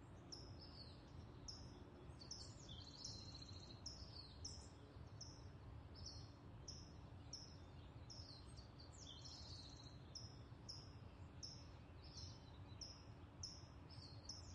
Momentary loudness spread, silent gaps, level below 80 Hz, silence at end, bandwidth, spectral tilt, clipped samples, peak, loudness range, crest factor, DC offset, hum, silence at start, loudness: 6 LU; none; -66 dBFS; 0 s; 11 kHz; -4 dB/octave; under 0.1%; -40 dBFS; 2 LU; 18 dB; under 0.1%; none; 0 s; -57 LUFS